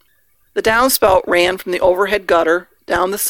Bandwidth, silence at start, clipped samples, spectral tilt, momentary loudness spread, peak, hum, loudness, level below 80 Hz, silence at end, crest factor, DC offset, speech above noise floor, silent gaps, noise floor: 18 kHz; 0.55 s; under 0.1%; -2.5 dB/octave; 7 LU; 0 dBFS; none; -15 LUFS; -42 dBFS; 0 s; 16 dB; under 0.1%; 45 dB; none; -59 dBFS